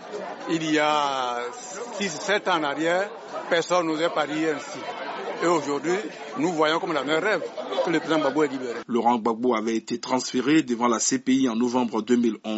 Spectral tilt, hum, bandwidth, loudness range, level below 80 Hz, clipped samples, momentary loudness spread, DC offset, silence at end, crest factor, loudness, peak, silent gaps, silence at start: -3 dB/octave; none; 8 kHz; 2 LU; -74 dBFS; under 0.1%; 10 LU; under 0.1%; 0 s; 18 dB; -24 LUFS; -8 dBFS; none; 0 s